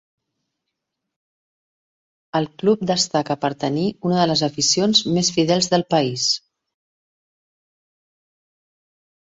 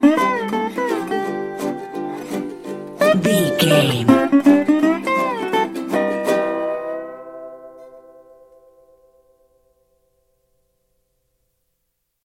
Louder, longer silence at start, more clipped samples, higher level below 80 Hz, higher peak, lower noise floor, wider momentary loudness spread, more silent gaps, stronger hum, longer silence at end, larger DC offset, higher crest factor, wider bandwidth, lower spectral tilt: about the same, -19 LUFS vs -18 LUFS; first, 2.35 s vs 0 s; neither; about the same, -60 dBFS vs -60 dBFS; about the same, -2 dBFS vs 0 dBFS; first, -80 dBFS vs -73 dBFS; second, 7 LU vs 17 LU; neither; second, none vs 60 Hz at -50 dBFS; second, 2.9 s vs 4.25 s; neither; about the same, 20 dB vs 20 dB; second, 8 kHz vs 16 kHz; second, -4 dB/octave vs -5.5 dB/octave